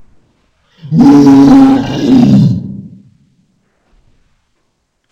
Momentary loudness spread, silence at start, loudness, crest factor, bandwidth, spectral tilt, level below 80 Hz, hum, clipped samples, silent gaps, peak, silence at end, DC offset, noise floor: 15 LU; 0.85 s; -6 LUFS; 10 dB; 7.6 kHz; -8 dB/octave; -38 dBFS; none; 2%; none; 0 dBFS; 2.25 s; under 0.1%; -62 dBFS